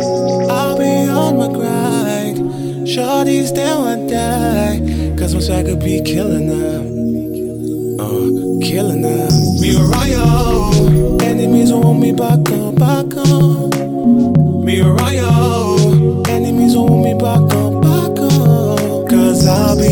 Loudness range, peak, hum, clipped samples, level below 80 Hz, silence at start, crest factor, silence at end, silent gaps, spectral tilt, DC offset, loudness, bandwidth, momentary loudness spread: 5 LU; 0 dBFS; none; under 0.1%; -28 dBFS; 0 s; 12 dB; 0 s; none; -6.5 dB/octave; under 0.1%; -13 LUFS; 17.5 kHz; 7 LU